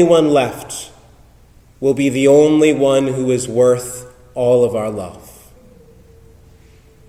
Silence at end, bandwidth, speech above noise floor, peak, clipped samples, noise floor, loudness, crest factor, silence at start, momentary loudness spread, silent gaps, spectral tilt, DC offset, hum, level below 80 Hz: 1.9 s; 15.5 kHz; 33 dB; -2 dBFS; under 0.1%; -47 dBFS; -14 LUFS; 16 dB; 0 s; 18 LU; none; -5.5 dB/octave; under 0.1%; none; -48 dBFS